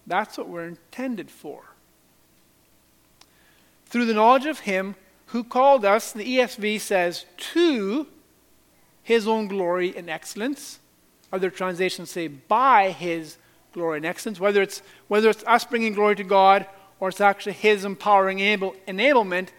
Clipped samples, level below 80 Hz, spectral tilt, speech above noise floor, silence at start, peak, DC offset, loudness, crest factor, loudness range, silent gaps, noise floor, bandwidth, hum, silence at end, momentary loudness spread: under 0.1%; -72 dBFS; -4.5 dB/octave; 38 dB; 0.05 s; -2 dBFS; under 0.1%; -22 LUFS; 20 dB; 7 LU; none; -60 dBFS; 17.5 kHz; none; 0.1 s; 16 LU